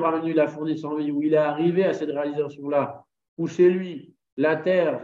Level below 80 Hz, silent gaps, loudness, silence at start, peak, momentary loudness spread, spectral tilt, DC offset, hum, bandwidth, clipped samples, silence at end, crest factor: -74 dBFS; 3.28-3.37 s, 4.32-4.37 s; -23 LUFS; 0 s; -8 dBFS; 11 LU; -7.5 dB/octave; under 0.1%; none; 7.4 kHz; under 0.1%; 0 s; 16 dB